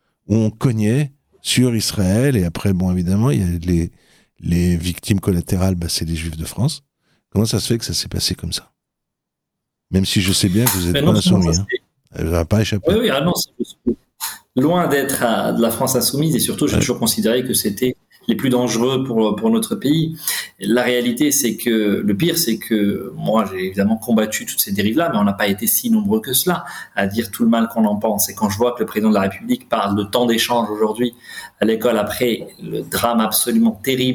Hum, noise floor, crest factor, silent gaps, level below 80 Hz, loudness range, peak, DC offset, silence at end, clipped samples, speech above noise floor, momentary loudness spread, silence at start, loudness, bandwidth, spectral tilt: none; -80 dBFS; 18 dB; none; -44 dBFS; 3 LU; 0 dBFS; under 0.1%; 0 s; under 0.1%; 62 dB; 8 LU; 0.3 s; -18 LUFS; over 20 kHz; -5 dB/octave